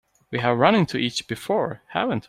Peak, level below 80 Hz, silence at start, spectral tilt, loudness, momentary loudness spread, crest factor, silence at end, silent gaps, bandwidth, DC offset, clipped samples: -2 dBFS; -58 dBFS; 0.3 s; -5.5 dB/octave; -23 LUFS; 10 LU; 20 dB; 0.05 s; none; 16 kHz; under 0.1%; under 0.1%